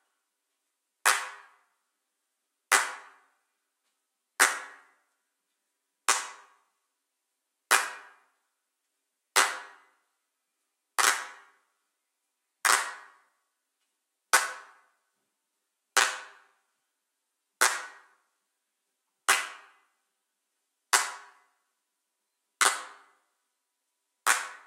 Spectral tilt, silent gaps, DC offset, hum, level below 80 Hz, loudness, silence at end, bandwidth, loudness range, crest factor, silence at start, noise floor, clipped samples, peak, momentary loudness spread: 3.5 dB/octave; none; under 0.1%; none; under -90 dBFS; -27 LUFS; 0.1 s; 16 kHz; 3 LU; 28 dB; 1.05 s; -83 dBFS; under 0.1%; -6 dBFS; 20 LU